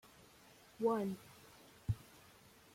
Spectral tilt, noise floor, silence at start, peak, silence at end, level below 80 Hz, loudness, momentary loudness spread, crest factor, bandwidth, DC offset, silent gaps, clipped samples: -7.5 dB/octave; -64 dBFS; 0.8 s; -24 dBFS; 0.75 s; -64 dBFS; -41 LUFS; 25 LU; 20 dB; 16.5 kHz; under 0.1%; none; under 0.1%